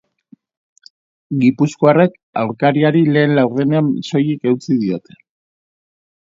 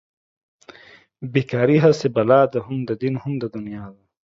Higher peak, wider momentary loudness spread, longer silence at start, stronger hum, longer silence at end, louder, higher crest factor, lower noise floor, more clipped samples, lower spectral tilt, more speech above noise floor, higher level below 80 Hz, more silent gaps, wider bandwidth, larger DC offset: about the same, 0 dBFS vs -2 dBFS; second, 9 LU vs 17 LU; about the same, 1.3 s vs 1.2 s; neither; first, 1.3 s vs 0.3 s; first, -15 LUFS vs -19 LUFS; about the same, 16 dB vs 18 dB; about the same, -50 dBFS vs -49 dBFS; neither; about the same, -7.5 dB/octave vs -7.5 dB/octave; first, 35 dB vs 30 dB; about the same, -62 dBFS vs -60 dBFS; first, 2.23-2.33 s vs none; about the same, 7.8 kHz vs 7.8 kHz; neither